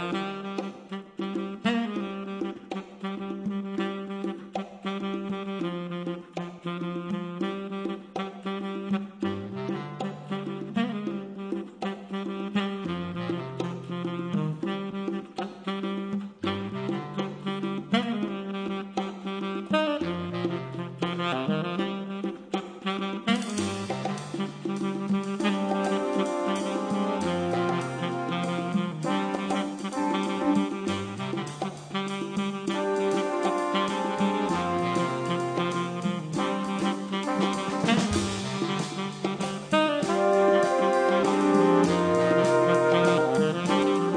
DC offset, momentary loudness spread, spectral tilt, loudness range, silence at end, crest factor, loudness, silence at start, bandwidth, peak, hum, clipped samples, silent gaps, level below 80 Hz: under 0.1%; 11 LU; -6 dB/octave; 10 LU; 0 s; 20 dB; -28 LUFS; 0 s; 10.5 kHz; -8 dBFS; none; under 0.1%; none; -62 dBFS